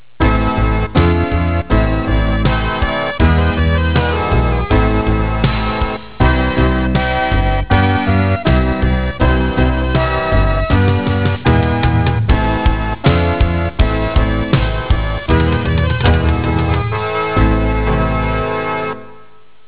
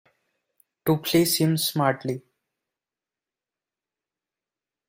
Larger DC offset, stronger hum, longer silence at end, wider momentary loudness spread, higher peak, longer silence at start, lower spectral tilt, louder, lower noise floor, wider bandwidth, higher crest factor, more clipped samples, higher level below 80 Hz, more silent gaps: first, 2% vs under 0.1%; neither; second, 0.55 s vs 2.7 s; second, 4 LU vs 11 LU; first, -4 dBFS vs -8 dBFS; second, 0.2 s vs 0.85 s; first, -11 dB/octave vs -4.5 dB/octave; first, -15 LUFS vs -23 LUFS; second, -46 dBFS vs under -90 dBFS; second, 4 kHz vs 16 kHz; second, 10 dB vs 20 dB; neither; first, -18 dBFS vs -64 dBFS; neither